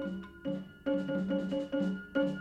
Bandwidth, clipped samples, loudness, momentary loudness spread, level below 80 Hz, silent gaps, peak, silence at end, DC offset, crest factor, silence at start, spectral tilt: 8.6 kHz; under 0.1%; -35 LUFS; 6 LU; -62 dBFS; none; -20 dBFS; 0 s; under 0.1%; 14 dB; 0 s; -8 dB/octave